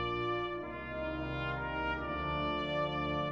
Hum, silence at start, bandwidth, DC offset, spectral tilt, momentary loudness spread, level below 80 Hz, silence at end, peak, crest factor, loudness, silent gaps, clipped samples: none; 0 s; 7.4 kHz; under 0.1%; -7 dB/octave; 5 LU; -50 dBFS; 0 s; -24 dBFS; 12 dB; -36 LUFS; none; under 0.1%